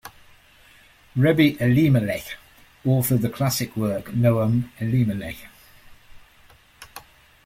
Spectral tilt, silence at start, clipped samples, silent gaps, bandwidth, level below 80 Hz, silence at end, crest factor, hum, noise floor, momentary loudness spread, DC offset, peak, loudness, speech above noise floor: -6.5 dB/octave; 0.05 s; under 0.1%; none; 16.5 kHz; -52 dBFS; 0.45 s; 20 dB; none; -53 dBFS; 22 LU; under 0.1%; -4 dBFS; -22 LUFS; 33 dB